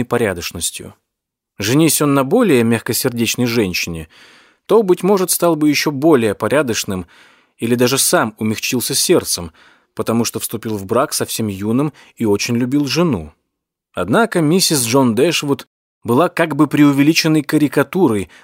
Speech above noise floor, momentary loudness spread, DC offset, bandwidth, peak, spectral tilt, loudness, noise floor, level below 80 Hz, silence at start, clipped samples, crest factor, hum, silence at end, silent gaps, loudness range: 64 dB; 10 LU; under 0.1%; 16.5 kHz; 0 dBFS; -4.5 dB/octave; -15 LUFS; -80 dBFS; -50 dBFS; 0 s; under 0.1%; 16 dB; none; 0.2 s; 15.67-16.01 s; 4 LU